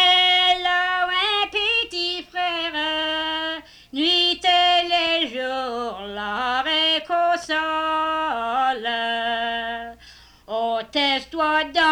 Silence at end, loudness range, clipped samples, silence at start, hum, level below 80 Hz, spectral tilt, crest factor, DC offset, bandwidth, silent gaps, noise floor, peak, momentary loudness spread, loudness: 0 s; 4 LU; under 0.1%; 0 s; 60 Hz at -60 dBFS; -54 dBFS; -2 dB/octave; 14 dB; under 0.1%; 19 kHz; none; -48 dBFS; -8 dBFS; 11 LU; -21 LUFS